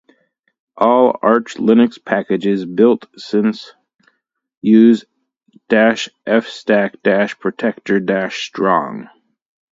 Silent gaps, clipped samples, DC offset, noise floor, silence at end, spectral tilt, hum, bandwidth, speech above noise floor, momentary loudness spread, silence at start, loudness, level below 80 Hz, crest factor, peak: 4.57-4.61 s; under 0.1%; under 0.1%; -66 dBFS; 0.7 s; -6 dB/octave; none; 7.6 kHz; 51 dB; 9 LU; 0.75 s; -15 LUFS; -64 dBFS; 16 dB; 0 dBFS